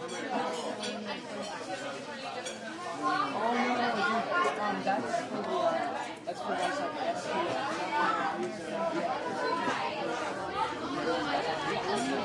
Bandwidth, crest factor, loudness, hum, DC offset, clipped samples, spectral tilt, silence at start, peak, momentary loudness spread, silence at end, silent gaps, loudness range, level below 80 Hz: 11.5 kHz; 16 dB; -32 LUFS; none; under 0.1%; under 0.1%; -4 dB/octave; 0 s; -16 dBFS; 9 LU; 0 s; none; 3 LU; -72 dBFS